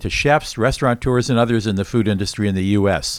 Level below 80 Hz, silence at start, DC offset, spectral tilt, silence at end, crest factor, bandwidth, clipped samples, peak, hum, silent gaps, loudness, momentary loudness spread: -36 dBFS; 0 s; under 0.1%; -5.5 dB/octave; 0 s; 16 dB; 15.5 kHz; under 0.1%; -2 dBFS; none; none; -18 LUFS; 4 LU